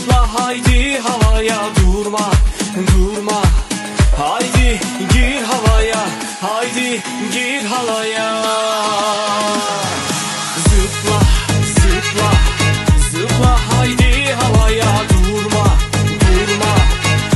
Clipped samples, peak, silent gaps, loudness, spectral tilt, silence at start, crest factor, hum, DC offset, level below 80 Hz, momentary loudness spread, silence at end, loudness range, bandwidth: under 0.1%; 0 dBFS; none; -14 LUFS; -4.5 dB/octave; 0 s; 12 dB; none; under 0.1%; -18 dBFS; 5 LU; 0 s; 3 LU; 12.5 kHz